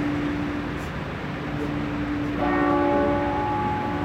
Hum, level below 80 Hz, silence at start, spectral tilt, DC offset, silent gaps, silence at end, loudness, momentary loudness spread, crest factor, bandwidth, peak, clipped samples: none; -40 dBFS; 0 s; -7.5 dB/octave; under 0.1%; none; 0 s; -25 LUFS; 9 LU; 14 dB; 8.6 kHz; -10 dBFS; under 0.1%